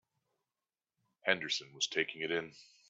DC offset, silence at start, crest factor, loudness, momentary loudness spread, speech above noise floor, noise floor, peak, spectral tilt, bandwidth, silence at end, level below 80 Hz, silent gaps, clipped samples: under 0.1%; 1.25 s; 26 dB; -35 LUFS; 6 LU; over 53 dB; under -90 dBFS; -12 dBFS; -2 dB/octave; 8.2 kHz; 0.25 s; -82 dBFS; none; under 0.1%